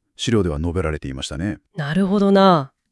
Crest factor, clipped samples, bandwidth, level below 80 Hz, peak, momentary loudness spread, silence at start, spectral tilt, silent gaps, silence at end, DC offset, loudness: 16 dB; under 0.1%; 12 kHz; -38 dBFS; -2 dBFS; 13 LU; 0.2 s; -6.5 dB/octave; none; 0.25 s; under 0.1%; -19 LUFS